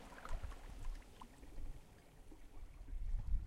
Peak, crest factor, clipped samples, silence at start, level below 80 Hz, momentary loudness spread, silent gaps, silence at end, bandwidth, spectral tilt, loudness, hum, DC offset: -26 dBFS; 18 dB; under 0.1%; 0 s; -46 dBFS; 14 LU; none; 0 s; 12 kHz; -5.5 dB/octave; -54 LUFS; none; under 0.1%